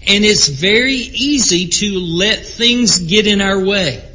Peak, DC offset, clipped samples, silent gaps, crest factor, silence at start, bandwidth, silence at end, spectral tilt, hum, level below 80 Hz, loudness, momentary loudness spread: 0 dBFS; under 0.1%; under 0.1%; none; 14 dB; 0 s; 7.8 kHz; 0 s; -2.5 dB/octave; none; -36 dBFS; -12 LUFS; 5 LU